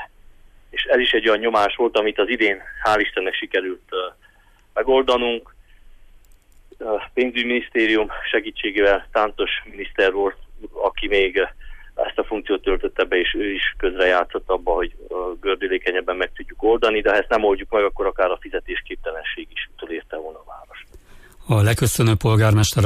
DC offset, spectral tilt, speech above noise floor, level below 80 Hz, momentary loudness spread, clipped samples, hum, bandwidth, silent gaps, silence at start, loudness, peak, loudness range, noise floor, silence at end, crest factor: under 0.1%; -5 dB/octave; 33 dB; -38 dBFS; 12 LU; under 0.1%; none; 15.5 kHz; none; 0 s; -20 LUFS; -6 dBFS; 5 LU; -53 dBFS; 0 s; 16 dB